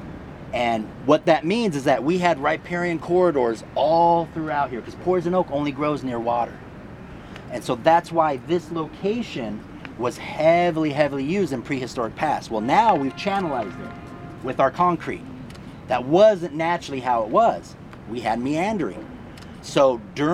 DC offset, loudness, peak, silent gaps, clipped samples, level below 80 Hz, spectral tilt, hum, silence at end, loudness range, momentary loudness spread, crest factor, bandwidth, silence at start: under 0.1%; -22 LUFS; -2 dBFS; none; under 0.1%; -50 dBFS; -6 dB/octave; none; 0 s; 3 LU; 20 LU; 20 dB; 13 kHz; 0 s